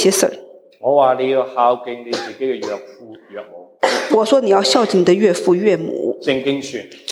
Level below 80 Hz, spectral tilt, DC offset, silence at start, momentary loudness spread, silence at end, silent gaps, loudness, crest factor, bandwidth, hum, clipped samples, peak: -66 dBFS; -4 dB/octave; under 0.1%; 0 s; 15 LU; 0 s; none; -16 LUFS; 16 dB; 16 kHz; none; under 0.1%; -2 dBFS